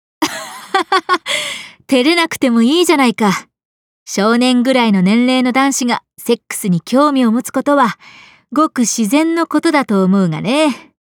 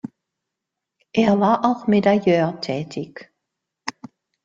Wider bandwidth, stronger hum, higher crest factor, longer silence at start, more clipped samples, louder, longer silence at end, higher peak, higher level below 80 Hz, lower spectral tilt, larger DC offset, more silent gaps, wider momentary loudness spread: first, 19 kHz vs 7.6 kHz; neither; second, 12 dB vs 18 dB; second, 0.2 s vs 1.15 s; neither; first, -14 LUFS vs -19 LUFS; second, 0.4 s vs 0.55 s; about the same, -2 dBFS vs -4 dBFS; second, -68 dBFS vs -62 dBFS; second, -4.5 dB/octave vs -7 dB/octave; neither; first, 3.65-4.06 s vs none; second, 8 LU vs 17 LU